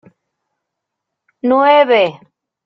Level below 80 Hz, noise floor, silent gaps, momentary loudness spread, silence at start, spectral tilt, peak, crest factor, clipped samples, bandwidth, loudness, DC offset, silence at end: -66 dBFS; -78 dBFS; none; 9 LU; 1.45 s; -6.5 dB/octave; -2 dBFS; 16 dB; under 0.1%; 6 kHz; -12 LUFS; under 0.1%; 0.55 s